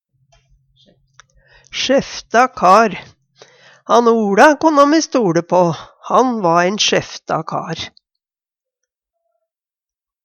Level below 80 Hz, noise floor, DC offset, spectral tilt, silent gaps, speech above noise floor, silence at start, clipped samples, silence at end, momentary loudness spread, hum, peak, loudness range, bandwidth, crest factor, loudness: -56 dBFS; under -90 dBFS; under 0.1%; -4 dB/octave; none; over 76 dB; 1.75 s; under 0.1%; 2.35 s; 14 LU; none; 0 dBFS; 7 LU; 13.5 kHz; 16 dB; -14 LUFS